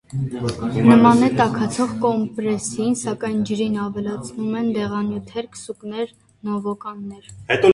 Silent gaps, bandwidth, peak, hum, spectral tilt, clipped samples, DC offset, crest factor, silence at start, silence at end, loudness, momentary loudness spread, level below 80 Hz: none; 11.5 kHz; 0 dBFS; none; -6 dB/octave; under 0.1%; under 0.1%; 20 dB; 0.1 s; 0 s; -20 LUFS; 17 LU; -52 dBFS